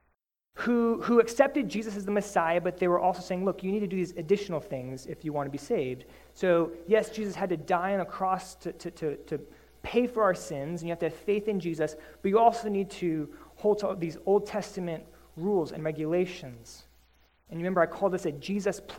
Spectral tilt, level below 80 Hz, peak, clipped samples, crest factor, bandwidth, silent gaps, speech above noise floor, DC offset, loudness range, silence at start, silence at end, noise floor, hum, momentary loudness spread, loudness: -6 dB/octave; -60 dBFS; -8 dBFS; under 0.1%; 22 dB; 16 kHz; none; 47 dB; under 0.1%; 4 LU; 0.55 s; 0 s; -76 dBFS; none; 12 LU; -29 LUFS